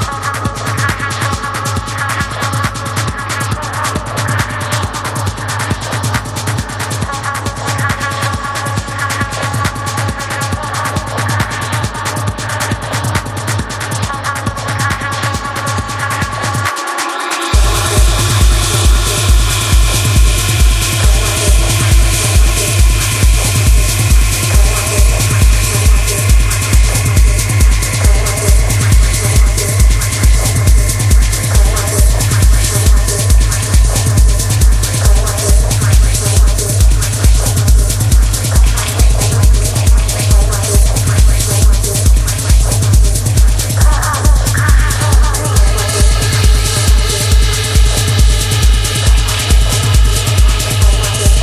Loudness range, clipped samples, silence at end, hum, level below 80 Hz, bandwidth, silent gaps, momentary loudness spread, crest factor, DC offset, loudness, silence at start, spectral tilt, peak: 6 LU; under 0.1%; 0 s; none; -12 dBFS; 15.5 kHz; none; 6 LU; 10 dB; under 0.1%; -12 LUFS; 0 s; -3.5 dB/octave; 0 dBFS